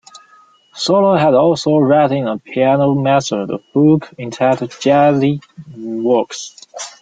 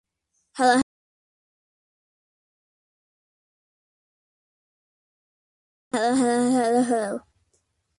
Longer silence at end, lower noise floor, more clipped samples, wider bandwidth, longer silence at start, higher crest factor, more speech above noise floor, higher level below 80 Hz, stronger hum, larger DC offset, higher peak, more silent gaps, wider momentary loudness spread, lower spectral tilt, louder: second, 0.1 s vs 0.8 s; second, -49 dBFS vs -75 dBFS; neither; second, 9.2 kHz vs 11.5 kHz; first, 0.75 s vs 0.55 s; second, 14 dB vs 22 dB; second, 35 dB vs 54 dB; first, -58 dBFS vs -68 dBFS; neither; neither; first, -2 dBFS vs -6 dBFS; second, none vs 0.83-5.91 s; about the same, 14 LU vs 12 LU; first, -6 dB/octave vs -3.5 dB/octave; first, -14 LUFS vs -22 LUFS